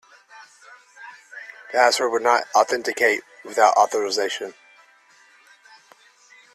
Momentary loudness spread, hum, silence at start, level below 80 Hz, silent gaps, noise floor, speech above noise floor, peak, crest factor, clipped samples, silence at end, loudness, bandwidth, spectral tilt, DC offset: 22 LU; none; 0.4 s; -74 dBFS; none; -55 dBFS; 35 dB; -2 dBFS; 20 dB; under 0.1%; 2.05 s; -20 LUFS; 14 kHz; -0.5 dB/octave; under 0.1%